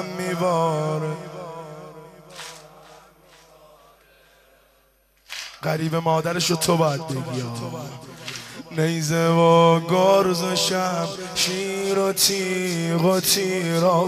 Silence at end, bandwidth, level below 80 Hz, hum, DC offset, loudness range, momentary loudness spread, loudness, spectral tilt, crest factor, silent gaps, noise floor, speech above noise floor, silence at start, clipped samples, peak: 0 s; 15 kHz; -60 dBFS; none; under 0.1%; 17 LU; 19 LU; -21 LUFS; -4.5 dB/octave; 20 dB; none; -61 dBFS; 40 dB; 0 s; under 0.1%; -4 dBFS